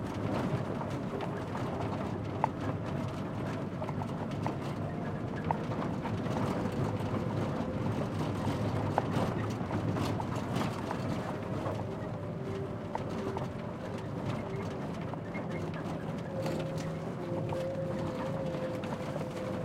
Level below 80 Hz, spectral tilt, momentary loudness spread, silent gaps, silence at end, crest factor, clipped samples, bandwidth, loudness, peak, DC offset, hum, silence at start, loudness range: -56 dBFS; -7.5 dB/octave; 5 LU; none; 0 s; 24 dB; under 0.1%; 15.5 kHz; -35 LUFS; -10 dBFS; under 0.1%; none; 0 s; 4 LU